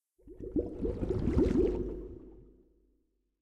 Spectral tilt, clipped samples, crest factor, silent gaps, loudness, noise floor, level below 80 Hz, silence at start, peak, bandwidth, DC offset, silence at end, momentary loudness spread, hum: -9.5 dB/octave; under 0.1%; 22 dB; none; -32 LUFS; -76 dBFS; -42 dBFS; 0.25 s; -12 dBFS; 9.2 kHz; under 0.1%; 0.95 s; 19 LU; none